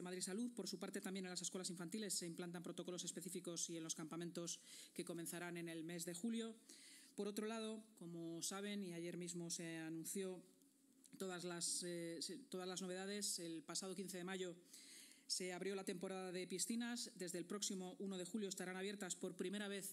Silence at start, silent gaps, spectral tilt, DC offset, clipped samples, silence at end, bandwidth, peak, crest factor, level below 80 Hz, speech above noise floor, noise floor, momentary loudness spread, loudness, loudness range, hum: 0 s; none; -3 dB/octave; under 0.1%; under 0.1%; 0 s; 16 kHz; -28 dBFS; 20 dB; under -90 dBFS; 25 dB; -73 dBFS; 8 LU; -48 LUFS; 3 LU; none